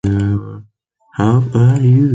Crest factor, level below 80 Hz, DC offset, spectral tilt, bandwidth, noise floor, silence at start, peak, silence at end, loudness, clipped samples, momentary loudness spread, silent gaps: 12 dB; -38 dBFS; under 0.1%; -9 dB/octave; 7.8 kHz; -54 dBFS; 0.05 s; -2 dBFS; 0 s; -14 LUFS; under 0.1%; 15 LU; none